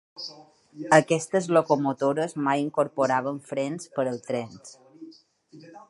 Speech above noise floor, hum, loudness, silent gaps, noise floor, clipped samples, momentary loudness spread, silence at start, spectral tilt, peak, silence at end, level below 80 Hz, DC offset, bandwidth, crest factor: 24 dB; none; -25 LUFS; none; -49 dBFS; under 0.1%; 18 LU; 0.15 s; -5.5 dB/octave; -2 dBFS; 0.1 s; -76 dBFS; under 0.1%; 11.5 kHz; 24 dB